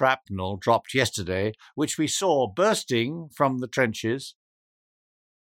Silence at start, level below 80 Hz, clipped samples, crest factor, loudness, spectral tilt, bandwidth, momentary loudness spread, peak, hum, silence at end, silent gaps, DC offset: 0 s; -62 dBFS; under 0.1%; 20 dB; -25 LUFS; -4 dB/octave; 17.5 kHz; 8 LU; -6 dBFS; none; 1.15 s; none; under 0.1%